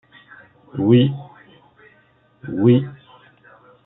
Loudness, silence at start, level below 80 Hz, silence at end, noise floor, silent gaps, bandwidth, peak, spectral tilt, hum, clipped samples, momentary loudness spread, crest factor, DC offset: -17 LUFS; 0.75 s; -62 dBFS; 0.9 s; -57 dBFS; none; 4 kHz; -2 dBFS; -12.5 dB/octave; none; under 0.1%; 19 LU; 18 dB; under 0.1%